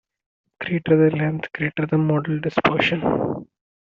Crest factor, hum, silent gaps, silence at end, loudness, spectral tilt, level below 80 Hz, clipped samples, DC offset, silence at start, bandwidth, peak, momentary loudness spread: 20 dB; none; none; 0.55 s; -21 LUFS; -5.5 dB/octave; -56 dBFS; under 0.1%; under 0.1%; 0.6 s; 6.8 kHz; -2 dBFS; 9 LU